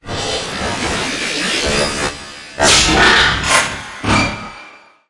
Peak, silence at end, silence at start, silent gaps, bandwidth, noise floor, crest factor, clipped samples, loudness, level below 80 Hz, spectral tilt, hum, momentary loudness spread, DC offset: 0 dBFS; 0.3 s; 0.05 s; none; 11.5 kHz; -40 dBFS; 16 dB; under 0.1%; -14 LUFS; -32 dBFS; -2 dB/octave; none; 13 LU; under 0.1%